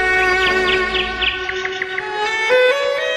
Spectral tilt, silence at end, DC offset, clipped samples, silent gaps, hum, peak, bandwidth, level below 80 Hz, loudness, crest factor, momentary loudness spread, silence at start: -3 dB/octave; 0 s; under 0.1%; under 0.1%; none; none; -2 dBFS; 13 kHz; -40 dBFS; -16 LUFS; 14 dB; 8 LU; 0 s